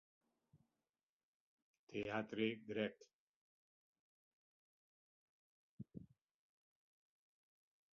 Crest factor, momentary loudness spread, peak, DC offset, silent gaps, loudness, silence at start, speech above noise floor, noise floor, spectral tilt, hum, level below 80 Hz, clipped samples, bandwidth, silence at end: 26 dB; 16 LU; -26 dBFS; under 0.1%; 3.13-5.78 s; -45 LUFS; 1.9 s; over 46 dB; under -90 dBFS; -4 dB/octave; none; -84 dBFS; under 0.1%; 6.8 kHz; 1.9 s